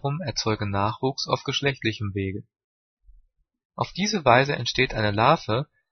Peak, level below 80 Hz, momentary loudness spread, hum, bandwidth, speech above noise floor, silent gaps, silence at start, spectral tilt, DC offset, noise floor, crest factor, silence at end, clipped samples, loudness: -2 dBFS; -50 dBFS; 12 LU; none; 6.6 kHz; 36 dB; 2.64-2.97 s, 3.65-3.70 s; 0.05 s; -5 dB/octave; under 0.1%; -60 dBFS; 22 dB; 0.25 s; under 0.1%; -24 LUFS